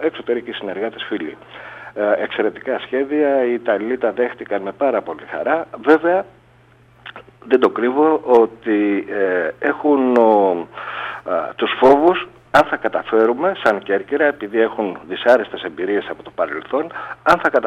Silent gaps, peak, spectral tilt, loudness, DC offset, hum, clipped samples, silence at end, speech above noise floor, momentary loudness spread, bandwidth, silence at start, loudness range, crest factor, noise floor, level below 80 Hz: none; -2 dBFS; -6 dB/octave; -18 LUFS; under 0.1%; none; under 0.1%; 0 s; 33 dB; 13 LU; 9.4 kHz; 0 s; 4 LU; 16 dB; -50 dBFS; -58 dBFS